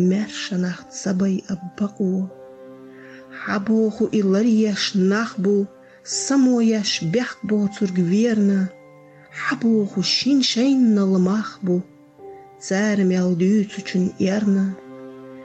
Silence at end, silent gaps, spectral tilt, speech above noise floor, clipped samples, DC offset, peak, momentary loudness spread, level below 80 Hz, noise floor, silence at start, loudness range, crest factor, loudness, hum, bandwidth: 0 s; none; -5.5 dB/octave; 27 dB; under 0.1%; under 0.1%; -10 dBFS; 11 LU; -64 dBFS; -46 dBFS; 0 s; 5 LU; 10 dB; -20 LUFS; none; 8.8 kHz